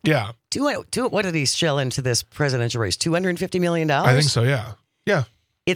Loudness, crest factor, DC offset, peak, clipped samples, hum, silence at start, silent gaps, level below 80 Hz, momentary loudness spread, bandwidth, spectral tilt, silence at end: -21 LUFS; 18 dB; under 0.1%; -4 dBFS; under 0.1%; none; 0.05 s; none; -56 dBFS; 8 LU; 16 kHz; -4.5 dB/octave; 0 s